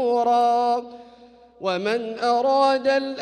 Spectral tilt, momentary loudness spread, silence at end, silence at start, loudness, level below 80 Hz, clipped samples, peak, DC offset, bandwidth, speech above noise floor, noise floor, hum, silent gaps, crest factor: -4.5 dB/octave; 9 LU; 0 s; 0 s; -21 LUFS; -68 dBFS; under 0.1%; -8 dBFS; under 0.1%; 9.8 kHz; 28 dB; -49 dBFS; none; none; 14 dB